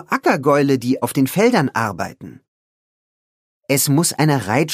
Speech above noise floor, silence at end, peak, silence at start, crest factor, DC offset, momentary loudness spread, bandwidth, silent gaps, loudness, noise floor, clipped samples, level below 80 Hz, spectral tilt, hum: over 73 dB; 0 s; -2 dBFS; 0.1 s; 18 dB; under 0.1%; 6 LU; 15.5 kHz; 2.48-3.61 s; -17 LUFS; under -90 dBFS; under 0.1%; -62 dBFS; -5 dB/octave; none